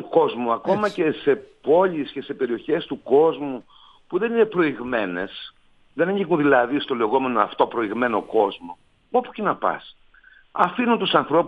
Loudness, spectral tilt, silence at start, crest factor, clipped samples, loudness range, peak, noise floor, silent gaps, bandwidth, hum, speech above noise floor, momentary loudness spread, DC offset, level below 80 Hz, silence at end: -22 LUFS; -7 dB/octave; 0 s; 20 dB; under 0.1%; 2 LU; -2 dBFS; -52 dBFS; none; 8.4 kHz; none; 31 dB; 12 LU; under 0.1%; -62 dBFS; 0 s